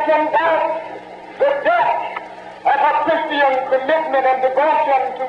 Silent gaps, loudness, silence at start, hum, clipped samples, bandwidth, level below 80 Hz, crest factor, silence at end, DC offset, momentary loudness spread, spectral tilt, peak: none; -17 LUFS; 0 s; none; under 0.1%; 8.2 kHz; -64 dBFS; 10 dB; 0 s; under 0.1%; 13 LU; -5 dB/octave; -6 dBFS